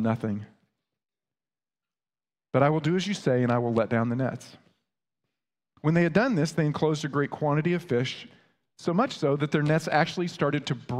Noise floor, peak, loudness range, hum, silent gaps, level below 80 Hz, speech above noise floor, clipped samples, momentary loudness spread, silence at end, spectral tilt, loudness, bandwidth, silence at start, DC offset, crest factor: under -90 dBFS; -8 dBFS; 2 LU; none; none; -66 dBFS; over 64 dB; under 0.1%; 7 LU; 0 s; -6.5 dB/octave; -26 LUFS; 12 kHz; 0 s; under 0.1%; 20 dB